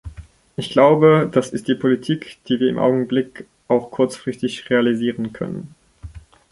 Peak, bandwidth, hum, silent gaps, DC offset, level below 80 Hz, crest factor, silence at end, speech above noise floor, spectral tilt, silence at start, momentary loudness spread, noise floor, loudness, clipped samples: -2 dBFS; 11.5 kHz; none; none; under 0.1%; -48 dBFS; 18 dB; 0.3 s; 21 dB; -6.5 dB/octave; 0.05 s; 15 LU; -39 dBFS; -19 LUFS; under 0.1%